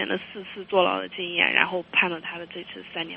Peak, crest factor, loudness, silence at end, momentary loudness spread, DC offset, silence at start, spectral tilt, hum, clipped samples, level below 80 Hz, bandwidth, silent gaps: -2 dBFS; 24 dB; -24 LUFS; 0 s; 17 LU; under 0.1%; 0 s; -0.5 dB/octave; none; under 0.1%; -68 dBFS; 5.2 kHz; none